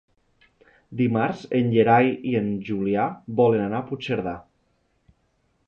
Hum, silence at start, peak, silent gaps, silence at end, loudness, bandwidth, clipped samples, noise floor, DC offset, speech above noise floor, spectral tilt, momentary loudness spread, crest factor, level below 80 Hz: none; 0.9 s; -6 dBFS; none; 1.25 s; -23 LUFS; 6.8 kHz; under 0.1%; -68 dBFS; under 0.1%; 46 dB; -8.5 dB/octave; 10 LU; 18 dB; -58 dBFS